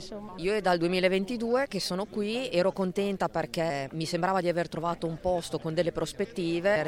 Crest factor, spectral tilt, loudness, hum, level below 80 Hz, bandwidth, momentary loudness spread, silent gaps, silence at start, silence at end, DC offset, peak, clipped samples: 18 dB; -5.5 dB/octave; -29 LUFS; none; -54 dBFS; 16.5 kHz; 6 LU; none; 0 s; 0 s; under 0.1%; -12 dBFS; under 0.1%